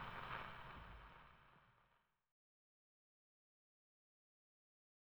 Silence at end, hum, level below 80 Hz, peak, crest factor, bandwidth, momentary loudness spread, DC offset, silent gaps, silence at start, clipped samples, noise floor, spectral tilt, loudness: 3.05 s; none; -70 dBFS; -36 dBFS; 24 dB; over 20 kHz; 16 LU; under 0.1%; none; 0 s; under 0.1%; -81 dBFS; -5.5 dB/octave; -54 LUFS